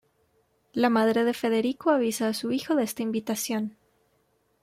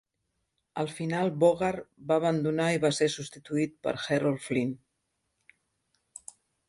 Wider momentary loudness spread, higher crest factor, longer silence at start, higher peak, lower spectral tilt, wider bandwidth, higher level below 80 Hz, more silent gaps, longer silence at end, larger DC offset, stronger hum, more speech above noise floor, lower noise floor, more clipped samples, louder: second, 7 LU vs 18 LU; about the same, 16 dB vs 20 dB; about the same, 0.75 s vs 0.75 s; about the same, -10 dBFS vs -10 dBFS; second, -4 dB/octave vs -5.5 dB/octave; first, 16 kHz vs 11.5 kHz; about the same, -72 dBFS vs -68 dBFS; neither; second, 0.9 s vs 1.9 s; neither; neither; second, 44 dB vs 52 dB; second, -69 dBFS vs -80 dBFS; neither; first, -26 LUFS vs -29 LUFS